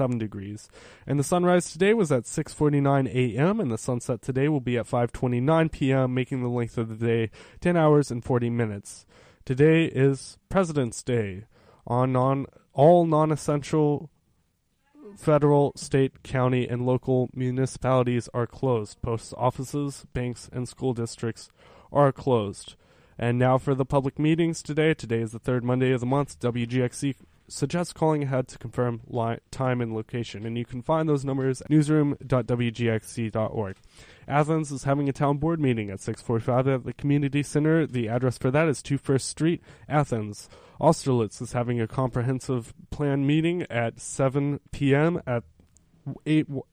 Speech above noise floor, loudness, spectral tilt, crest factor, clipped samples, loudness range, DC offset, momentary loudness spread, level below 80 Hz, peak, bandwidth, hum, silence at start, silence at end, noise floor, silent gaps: 45 dB; -25 LUFS; -7 dB/octave; 18 dB; under 0.1%; 4 LU; under 0.1%; 10 LU; -52 dBFS; -8 dBFS; 13 kHz; none; 0 s; 0.1 s; -70 dBFS; none